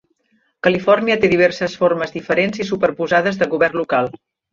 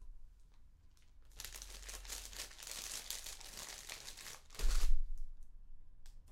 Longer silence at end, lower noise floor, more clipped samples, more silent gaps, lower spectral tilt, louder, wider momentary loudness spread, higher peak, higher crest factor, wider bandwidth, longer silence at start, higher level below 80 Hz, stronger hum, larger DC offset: first, 0.35 s vs 0 s; about the same, -63 dBFS vs -62 dBFS; neither; neither; first, -6 dB/octave vs -1.5 dB/octave; first, -17 LUFS vs -46 LUFS; second, 6 LU vs 22 LU; first, -2 dBFS vs -18 dBFS; about the same, 16 dB vs 20 dB; second, 7.6 kHz vs 16 kHz; first, 0.65 s vs 0 s; second, -54 dBFS vs -40 dBFS; neither; neither